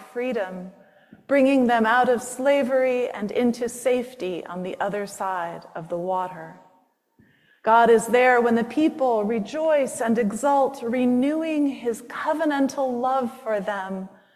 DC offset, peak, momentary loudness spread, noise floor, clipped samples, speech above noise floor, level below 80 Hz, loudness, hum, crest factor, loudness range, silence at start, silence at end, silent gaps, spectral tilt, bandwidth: under 0.1%; -6 dBFS; 13 LU; -63 dBFS; under 0.1%; 40 dB; -66 dBFS; -23 LUFS; none; 18 dB; 8 LU; 0 s; 0.25 s; none; -5 dB/octave; 14.5 kHz